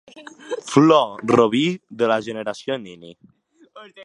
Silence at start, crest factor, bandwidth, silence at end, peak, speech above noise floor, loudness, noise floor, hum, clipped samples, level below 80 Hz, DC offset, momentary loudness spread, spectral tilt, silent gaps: 0.15 s; 20 dB; 11 kHz; 0 s; 0 dBFS; 26 dB; -19 LUFS; -46 dBFS; none; under 0.1%; -62 dBFS; under 0.1%; 17 LU; -5.5 dB/octave; none